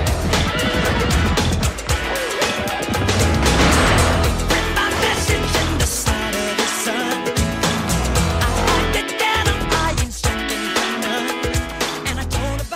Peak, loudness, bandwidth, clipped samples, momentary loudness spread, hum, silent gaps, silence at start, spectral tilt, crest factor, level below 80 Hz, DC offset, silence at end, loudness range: -2 dBFS; -18 LUFS; 16 kHz; under 0.1%; 6 LU; none; none; 0 s; -4 dB/octave; 16 dB; -26 dBFS; under 0.1%; 0 s; 3 LU